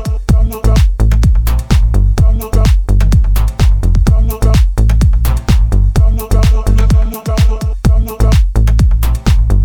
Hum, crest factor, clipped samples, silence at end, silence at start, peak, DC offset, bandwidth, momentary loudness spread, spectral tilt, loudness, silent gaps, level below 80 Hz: none; 8 dB; under 0.1%; 0 s; 0 s; 0 dBFS; under 0.1%; 17.5 kHz; 3 LU; -6.5 dB/octave; -12 LUFS; none; -10 dBFS